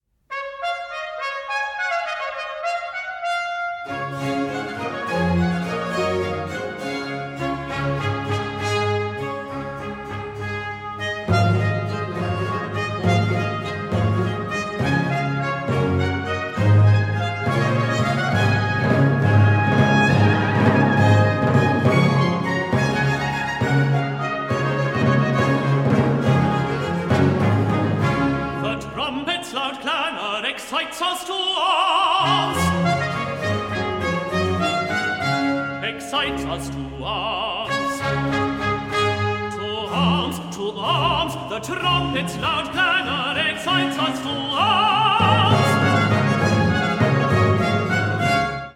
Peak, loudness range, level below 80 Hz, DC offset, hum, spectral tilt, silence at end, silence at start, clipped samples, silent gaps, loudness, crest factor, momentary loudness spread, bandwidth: -4 dBFS; 7 LU; -46 dBFS; under 0.1%; none; -6 dB/octave; 0.05 s; 0.3 s; under 0.1%; none; -21 LUFS; 18 dB; 10 LU; 14 kHz